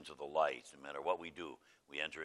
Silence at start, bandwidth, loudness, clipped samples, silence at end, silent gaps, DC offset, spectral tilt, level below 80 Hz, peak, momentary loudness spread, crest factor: 0 s; 12.5 kHz; -41 LUFS; under 0.1%; 0 s; none; under 0.1%; -3 dB/octave; -78 dBFS; -20 dBFS; 14 LU; 22 dB